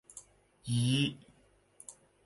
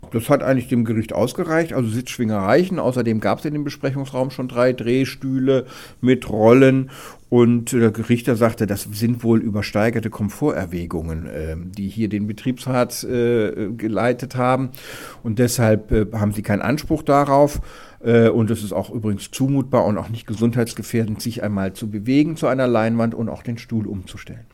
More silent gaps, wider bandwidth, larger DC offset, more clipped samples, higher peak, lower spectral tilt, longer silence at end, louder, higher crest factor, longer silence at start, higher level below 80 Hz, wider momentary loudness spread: neither; second, 11.5 kHz vs 17 kHz; neither; neither; second, -18 dBFS vs 0 dBFS; second, -5 dB/octave vs -6.5 dB/octave; first, 0.35 s vs 0.1 s; second, -32 LUFS vs -20 LUFS; about the same, 18 dB vs 20 dB; about the same, 0.15 s vs 0.05 s; second, -66 dBFS vs -42 dBFS; first, 22 LU vs 11 LU